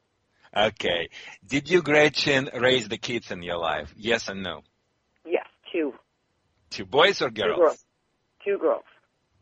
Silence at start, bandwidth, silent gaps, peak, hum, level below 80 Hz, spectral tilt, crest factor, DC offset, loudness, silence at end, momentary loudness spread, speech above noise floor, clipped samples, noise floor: 0.55 s; 9 kHz; none; -4 dBFS; none; -58 dBFS; -4 dB/octave; 22 dB; under 0.1%; -24 LUFS; 0.6 s; 15 LU; 48 dB; under 0.1%; -73 dBFS